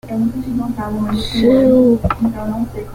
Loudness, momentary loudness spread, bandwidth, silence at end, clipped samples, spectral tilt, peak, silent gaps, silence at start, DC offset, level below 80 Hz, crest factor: -16 LUFS; 11 LU; 16 kHz; 0 s; under 0.1%; -7.5 dB/octave; -2 dBFS; none; 0.05 s; under 0.1%; -34 dBFS; 14 dB